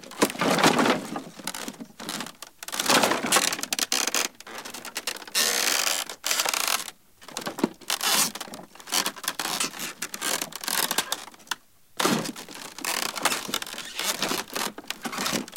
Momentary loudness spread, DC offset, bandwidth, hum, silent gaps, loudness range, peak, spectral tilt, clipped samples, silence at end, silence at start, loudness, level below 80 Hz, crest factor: 15 LU; 0.1%; 17 kHz; none; none; 4 LU; -6 dBFS; -1.5 dB/octave; under 0.1%; 0 s; 0 s; -26 LUFS; -68 dBFS; 22 dB